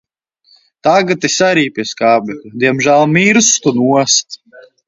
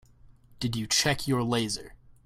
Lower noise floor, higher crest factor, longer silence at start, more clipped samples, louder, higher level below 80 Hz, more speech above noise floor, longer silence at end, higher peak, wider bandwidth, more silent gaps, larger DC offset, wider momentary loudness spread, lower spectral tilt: about the same, -54 dBFS vs -55 dBFS; second, 14 dB vs 20 dB; first, 0.85 s vs 0.6 s; neither; first, -11 LUFS vs -28 LUFS; second, -58 dBFS vs -52 dBFS; first, 42 dB vs 27 dB; about the same, 0.25 s vs 0.35 s; first, 0 dBFS vs -10 dBFS; second, 7.8 kHz vs 16 kHz; neither; neither; about the same, 9 LU vs 10 LU; about the same, -3 dB/octave vs -3.5 dB/octave